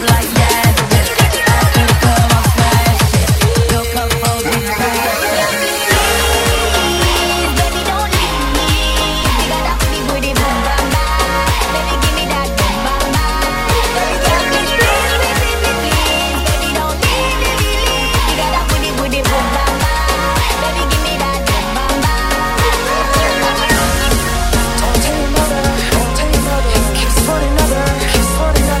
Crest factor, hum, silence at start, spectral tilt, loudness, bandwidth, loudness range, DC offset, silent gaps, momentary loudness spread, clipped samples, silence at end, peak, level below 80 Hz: 12 dB; none; 0 s; -4 dB/octave; -13 LUFS; 16.5 kHz; 3 LU; under 0.1%; none; 4 LU; under 0.1%; 0 s; 0 dBFS; -18 dBFS